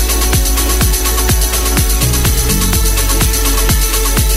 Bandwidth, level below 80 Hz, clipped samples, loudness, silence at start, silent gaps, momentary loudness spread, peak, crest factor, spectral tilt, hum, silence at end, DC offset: 16.5 kHz; -14 dBFS; under 0.1%; -12 LUFS; 0 s; none; 1 LU; 0 dBFS; 10 dB; -3 dB/octave; none; 0 s; under 0.1%